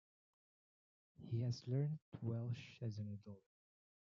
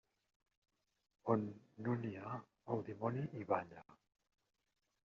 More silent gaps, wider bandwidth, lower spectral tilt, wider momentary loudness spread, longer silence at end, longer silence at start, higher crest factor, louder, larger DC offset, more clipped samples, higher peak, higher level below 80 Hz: first, 2.02-2.12 s vs none; about the same, 7.2 kHz vs 7 kHz; about the same, -8 dB/octave vs -8.5 dB/octave; first, 16 LU vs 10 LU; second, 0.7 s vs 1.1 s; about the same, 1.2 s vs 1.25 s; second, 18 dB vs 24 dB; about the same, -45 LUFS vs -43 LUFS; neither; neither; second, -30 dBFS vs -20 dBFS; about the same, -86 dBFS vs -82 dBFS